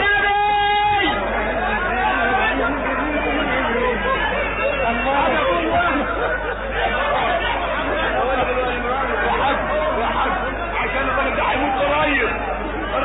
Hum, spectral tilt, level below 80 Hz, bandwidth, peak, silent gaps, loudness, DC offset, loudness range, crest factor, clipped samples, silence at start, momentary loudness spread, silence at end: none; -10 dB/octave; -32 dBFS; 4 kHz; -8 dBFS; none; -19 LUFS; under 0.1%; 1 LU; 12 dB; under 0.1%; 0 s; 4 LU; 0 s